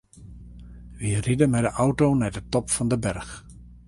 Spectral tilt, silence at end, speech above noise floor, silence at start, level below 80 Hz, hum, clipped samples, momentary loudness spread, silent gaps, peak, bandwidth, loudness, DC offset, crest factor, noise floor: -6 dB/octave; 0.1 s; 21 dB; 0.15 s; -44 dBFS; 60 Hz at -40 dBFS; under 0.1%; 24 LU; none; -6 dBFS; 11.5 kHz; -24 LUFS; under 0.1%; 18 dB; -44 dBFS